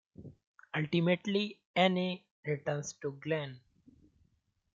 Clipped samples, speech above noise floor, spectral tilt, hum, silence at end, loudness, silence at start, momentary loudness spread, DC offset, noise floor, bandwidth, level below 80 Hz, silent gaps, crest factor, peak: under 0.1%; 43 dB; -5.5 dB/octave; none; 1.15 s; -34 LUFS; 0.2 s; 15 LU; under 0.1%; -75 dBFS; 7.6 kHz; -74 dBFS; 0.47-0.54 s, 1.65-1.74 s, 2.31-2.43 s; 22 dB; -14 dBFS